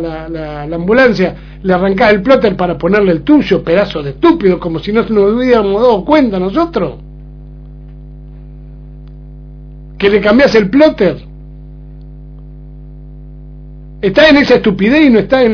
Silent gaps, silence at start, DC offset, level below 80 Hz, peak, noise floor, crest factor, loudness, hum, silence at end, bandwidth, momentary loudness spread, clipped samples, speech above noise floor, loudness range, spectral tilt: none; 0 s; under 0.1%; -32 dBFS; 0 dBFS; -30 dBFS; 12 dB; -10 LUFS; 50 Hz at -30 dBFS; 0 s; 5.4 kHz; 11 LU; 0.5%; 21 dB; 9 LU; -7 dB/octave